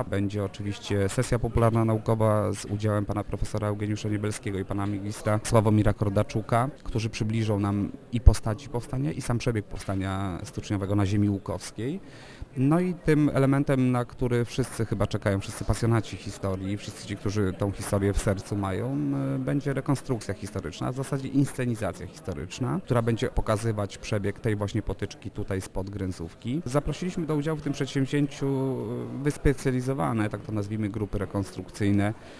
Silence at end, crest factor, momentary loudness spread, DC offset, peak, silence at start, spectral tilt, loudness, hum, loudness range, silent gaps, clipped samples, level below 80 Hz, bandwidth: 0 s; 26 dB; 10 LU; under 0.1%; 0 dBFS; 0 s; -7 dB/octave; -28 LUFS; none; 4 LU; none; under 0.1%; -38 dBFS; 11 kHz